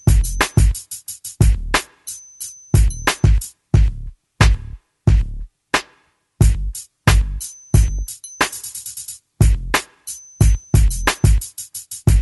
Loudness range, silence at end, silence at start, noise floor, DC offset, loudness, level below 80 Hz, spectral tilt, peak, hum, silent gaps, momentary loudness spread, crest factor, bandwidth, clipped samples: 2 LU; 0 s; 0.05 s; -58 dBFS; under 0.1%; -19 LUFS; -20 dBFS; -4.5 dB/octave; 0 dBFS; none; none; 15 LU; 16 dB; 12 kHz; under 0.1%